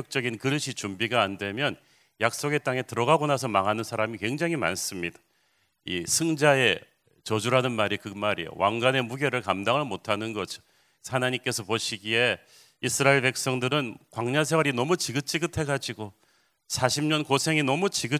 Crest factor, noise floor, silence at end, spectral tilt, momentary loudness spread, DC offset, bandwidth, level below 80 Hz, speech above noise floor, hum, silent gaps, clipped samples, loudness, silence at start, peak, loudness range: 22 dB; -70 dBFS; 0 s; -4 dB/octave; 10 LU; under 0.1%; 16 kHz; -60 dBFS; 43 dB; none; none; under 0.1%; -26 LUFS; 0 s; -4 dBFS; 3 LU